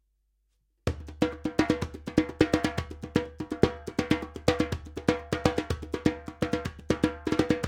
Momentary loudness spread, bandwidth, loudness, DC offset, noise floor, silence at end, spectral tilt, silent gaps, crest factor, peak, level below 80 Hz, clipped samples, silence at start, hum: 7 LU; 16.5 kHz; -29 LUFS; under 0.1%; -73 dBFS; 0 s; -6 dB/octave; none; 26 dB; -4 dBFS; -44 dBFS; under 0.1%; 0.85 s; none